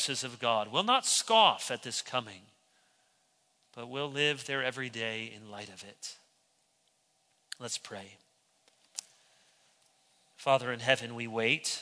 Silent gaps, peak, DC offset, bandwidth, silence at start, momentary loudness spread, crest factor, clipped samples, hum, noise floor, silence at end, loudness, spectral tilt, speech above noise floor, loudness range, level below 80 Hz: none; -10 dBFS; under 0.1%; 11 kHz; 0 s; 20 LU; 24 dB; under 0.1%; none; -73 dBFS; 0 s; -30 LUFS; -2 dB/octave; 41 dB; 16 LU; -84 dBFS